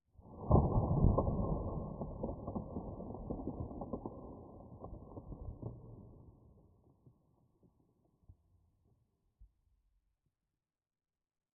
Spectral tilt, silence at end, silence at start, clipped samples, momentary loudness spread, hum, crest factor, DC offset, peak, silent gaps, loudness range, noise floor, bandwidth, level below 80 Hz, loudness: -6 dB/octave; 2.15 s; 0.25 s; under 0.1%; 22 LU; none; 26 dB; under 0.1%; -14 dBFS; none; 19 LU; under -90 dBFS; 1.3 kHz; -46 dBFS; -38 LUFS